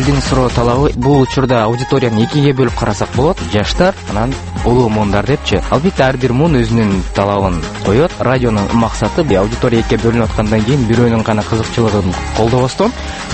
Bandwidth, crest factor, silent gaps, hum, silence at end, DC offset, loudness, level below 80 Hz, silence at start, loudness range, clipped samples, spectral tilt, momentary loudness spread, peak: 8.8 kHz; 12 dB; none; none; 0 s; under 0.1%; -13 LUFS; -26 dBFS; 0 s; 1 LU; under 0.1%; -6.5 dB/octave; 4 LU; 0 dBFS